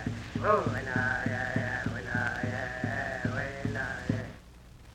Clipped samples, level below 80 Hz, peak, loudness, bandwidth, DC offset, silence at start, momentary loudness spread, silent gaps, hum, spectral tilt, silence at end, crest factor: under 0.1%; -50 dBFS; -12 dBFS; -32 LUFS; 11.5 kHz; under 0.1%; 0 s; 7 LU; none; none; -6.5 dB/octave; 0 s; 22 dB